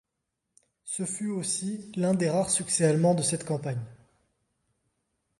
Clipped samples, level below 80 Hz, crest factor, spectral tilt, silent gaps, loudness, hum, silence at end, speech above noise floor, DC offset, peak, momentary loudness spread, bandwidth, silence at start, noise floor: under 0.1%; -66 dBFS; 18 dB; -5 dB/octave; none; -27 LUFS; none; 1.45 s; 56 dB; under 0.1%; -10 dBFS; 12 LU; 11.5 kHz; 0.85 s; -83 dBFS